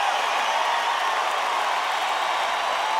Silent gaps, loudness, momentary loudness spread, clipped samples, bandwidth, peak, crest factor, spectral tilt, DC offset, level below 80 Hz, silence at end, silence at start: none; -23 LUFS; 1 LU; under 0.1%; 18.5 kHz; -10 dBFS; 14 dB; 1 dB/octave; under 0.1%; -70 dBFS; 0 s; 0 s